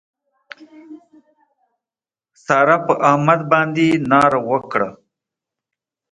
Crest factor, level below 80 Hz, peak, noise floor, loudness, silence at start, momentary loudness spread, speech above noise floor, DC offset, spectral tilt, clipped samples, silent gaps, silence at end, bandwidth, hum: 20 dB; -60 dBFS; 0 dBFS; under -90 dBFS; -16 LUFS; 0.6 s; 8 LU; over 75 dB; under 0.1%; -6.5 dB/octave; under 0.1%; none; 1.2 s; 11.5 kHz; none